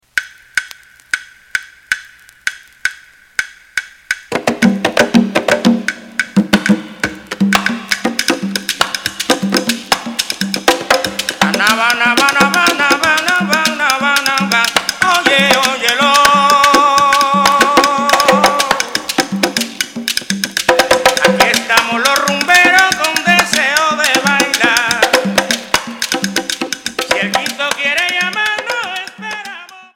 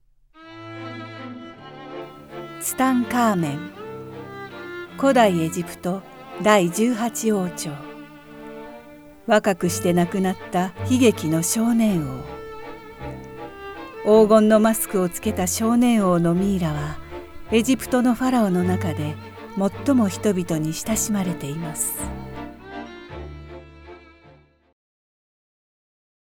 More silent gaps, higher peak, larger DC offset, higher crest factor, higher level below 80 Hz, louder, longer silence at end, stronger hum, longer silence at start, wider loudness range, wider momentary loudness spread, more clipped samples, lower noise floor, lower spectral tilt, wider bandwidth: neither; about the same, 0 dBFS vs -2 dBFS; neither; second, 14 dB vs 20 dB; about the same, -48 dBFS vs -48 dBFS; first, -12 LUFS vs -21 LUFS; second, 0.15 s vs 2.2 s; neither; second, 0.15 s vs 0.4 s; about the same, 7 LU vs 8 LU; second, 12 LU vs 20 LU; first, 0.5% vs under 0.1%; second, -38 dBFS vs -52 dBFS; second, -2.5 dB/octave vs -5 dB/octave; about the same, over 20 kHz vs 20 kHz